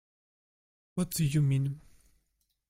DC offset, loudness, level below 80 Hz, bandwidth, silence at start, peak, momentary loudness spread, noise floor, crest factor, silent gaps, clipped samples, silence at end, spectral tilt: under 0.1%; -30 LUFS; -58 dBFS; 16 kHz; 0.95 s; -18 dBFS; 13 LU; -78 dBFS; 16 dB; none; under 0.1%; 0.9 s; -6 dB/octave